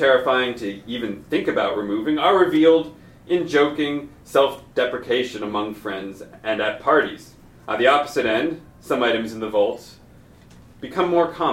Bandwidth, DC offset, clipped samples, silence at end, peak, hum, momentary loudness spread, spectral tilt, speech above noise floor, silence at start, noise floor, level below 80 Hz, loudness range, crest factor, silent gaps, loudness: 16 kHz; under 0.1%; under 0.1%; 0 s; -4 dBFS; none; 14 LU; -5 dB/octave; 27 dB; 0 s; -48 dBFS; -54 dBFS; 4 LU; 18 dB; none; -21 LUFS